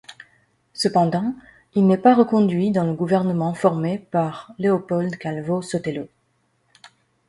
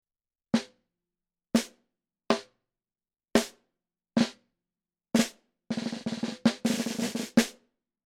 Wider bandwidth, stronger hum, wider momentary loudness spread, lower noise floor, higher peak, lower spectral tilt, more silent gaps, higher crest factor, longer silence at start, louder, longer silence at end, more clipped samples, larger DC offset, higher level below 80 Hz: second, 11.5 kHz vs 16.5 kHz; neither; first, 12 LU vs 8 LU; second, -67 dBFS vs under -90 dBFS; first, -2 dBFS vs -6 dBFS; first, -7 dB/octave vs -4 dB/octave; neither; second, 18 dB vs 26 dB; second, 0.1 s vs 0.55 s; first, -21 LUFS vs -30 LUFS; second, 0.4 s vs 0.55 s; neither; neither; about the same, -62 dBFS vs -66 dBFS